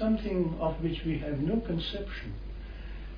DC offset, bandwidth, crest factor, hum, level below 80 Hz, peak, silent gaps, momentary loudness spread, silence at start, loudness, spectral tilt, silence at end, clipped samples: under 0.1%; 5.2 kHz; 14 dB; none; -40 dBFS; -16 dBFS; none; 14 LU; 0 s; -32 LUFS; -9 dB/octave; 0 s; under 0.1%